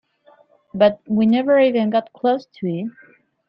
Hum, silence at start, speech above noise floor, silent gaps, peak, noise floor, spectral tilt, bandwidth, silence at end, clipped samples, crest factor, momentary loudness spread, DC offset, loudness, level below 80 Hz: none; 0.75 s; 36 dB; none; -2 dBFS; -54 dBFS; -9 dB/octave; 5.6 kHz; 0.6 s; under 0.1%; 16 dB; 12 LU; under 0.1%; -18 LUFS; -62 dBFS